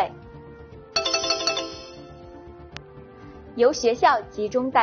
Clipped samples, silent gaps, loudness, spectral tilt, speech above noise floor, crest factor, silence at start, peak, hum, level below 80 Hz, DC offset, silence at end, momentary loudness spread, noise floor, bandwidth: under 0.1%; none; -23 LUFS; -1 dB/octave; 23 dB; 20 dB; 0 s; -6 dBFS; none; -52 dBFS; under 0.1%; 0 s; 24 LU; -44 dBFS; 7 kHz